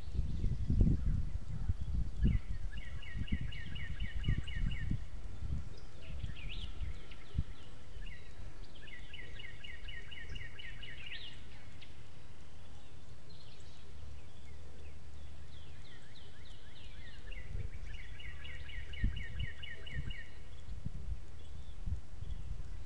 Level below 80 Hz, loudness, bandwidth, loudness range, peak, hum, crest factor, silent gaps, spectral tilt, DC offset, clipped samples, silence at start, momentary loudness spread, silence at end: -42 dBFS; -43 LUFS; 10.5 kHz; 14 LU; -14 dBFS; none; 26 dB; none; -6.5 dB/octave; 2%; under 0.1%; 0 s; 16 LU; 0 s